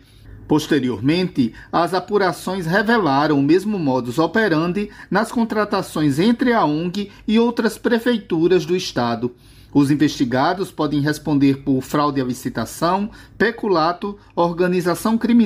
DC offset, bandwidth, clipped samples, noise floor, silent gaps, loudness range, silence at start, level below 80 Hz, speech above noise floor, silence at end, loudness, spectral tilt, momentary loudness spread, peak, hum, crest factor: under 0.1%; 16 kHz; under 0.1%; -40 dBFS; none; 2 LU; 0.25 s; -50 dBFS; 22 dB; 0 s; -19 LUFS; -6 dB/octave; 6 LU; -4 dBFS; none; 14 dB